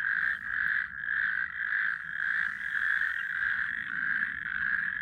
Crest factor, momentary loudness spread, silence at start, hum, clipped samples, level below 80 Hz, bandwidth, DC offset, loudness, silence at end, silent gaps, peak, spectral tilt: 16 dB; 3 LU; 0 s; none; under 0.1%; -64 dBFS; 10 kHz; under 0.1%; -29 LUFS; 0 s; none; -16 dBFS; -2.5 dB/octave